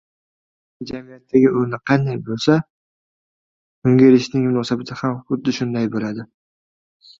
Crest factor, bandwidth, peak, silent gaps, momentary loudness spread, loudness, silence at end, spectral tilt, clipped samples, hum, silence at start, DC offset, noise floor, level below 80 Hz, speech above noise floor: 18 dB; 7.6 kHz; 0 dBFS; 2.70-3.82 s; 18 LU; -18 LUFS; 0.95 s; -7 dB/octave; under 0.1%; none; 0.8 s; under 0.1%; under -90 dBFS; -58 dBFS; over 72 dB